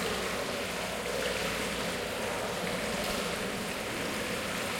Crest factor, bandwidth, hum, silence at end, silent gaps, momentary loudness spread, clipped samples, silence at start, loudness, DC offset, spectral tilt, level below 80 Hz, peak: 14 dB; 17 kHz; none; 0 s; none; 2 LU; under 0.1%; 0 s; -33 LUFS; under 0.1%; -3 dB/octave; -52 dBFS; -20 dBFS